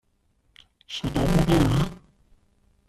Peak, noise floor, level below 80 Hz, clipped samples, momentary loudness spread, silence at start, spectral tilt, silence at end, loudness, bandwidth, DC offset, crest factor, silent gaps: -8 dBFS; -67 dBFS; -36 dBFS; under 0.1%; 12 LU; 0.9 s; -6.5 dB/octave; 0.9 s; -23 LUFS; 14 kHz; under 0.1%; 18 dB; none